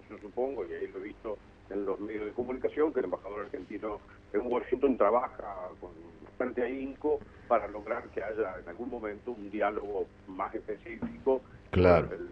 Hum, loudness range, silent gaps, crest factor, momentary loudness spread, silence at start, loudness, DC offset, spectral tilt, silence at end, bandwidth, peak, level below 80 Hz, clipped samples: 50 Hz at -60 dBFS; 4 LU; none; 22 dB; 14 LU; 0.1 s; -33 LUFS; under 0.1%; -9 dB/octave; 0 s; 6.2 kHz; -10 dBFS; -54 dBFS; under 0.1%